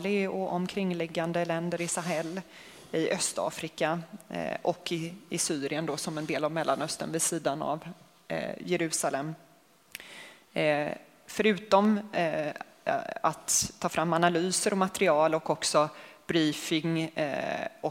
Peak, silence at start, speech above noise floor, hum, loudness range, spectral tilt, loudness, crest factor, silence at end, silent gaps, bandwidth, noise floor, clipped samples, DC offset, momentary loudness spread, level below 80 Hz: -8 dBFS; 0 s; 31 dB; none; 6 LU; -4 dB/octave; -30 LUFS; 22 dB; 0 s; none; 16 kHz; -61 dBFS; under 0.1%; under 0.1%; 12 LU; -68 dBFS